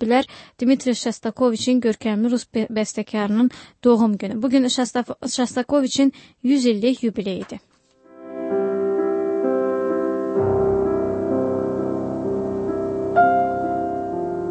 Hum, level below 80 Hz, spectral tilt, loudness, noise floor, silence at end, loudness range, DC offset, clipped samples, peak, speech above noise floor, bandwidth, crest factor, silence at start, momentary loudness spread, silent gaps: none; -52 dBFS; -5 dB/octave; -21 LUFS; -51 dBFS; 0 s; 3 LU; under 0.1%; under 0.1%; -4 dBFS; 31 dB; 8.8 kHz; 16 dB; 0 s; 8 LU; none